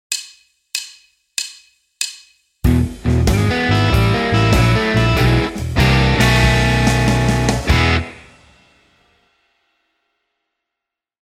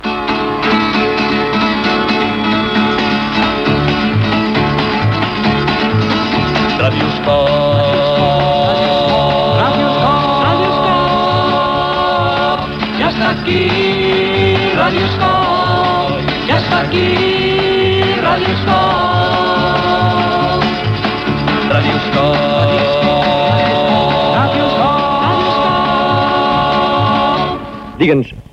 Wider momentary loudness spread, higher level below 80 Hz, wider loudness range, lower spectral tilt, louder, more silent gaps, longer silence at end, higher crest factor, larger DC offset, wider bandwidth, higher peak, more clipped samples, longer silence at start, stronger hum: first, 12 LU vs 3 LU; first, -24 dBFS vs -36 dBFS; first, 8 LU vs 1 LU; second, -5 dB/octave vs -6.5 dB/octave; second, -16 LUFS vs -13 LUFS; neither; first, 3.25 s vs 0.1 s; about the same, 16 dB vs 12 dB; neither; first, 16 kHz vs 9.4 kHz; about the same, -2 dBFS vs 0 dBFS; neither; about the same, 0.1 s vs 0 s; neither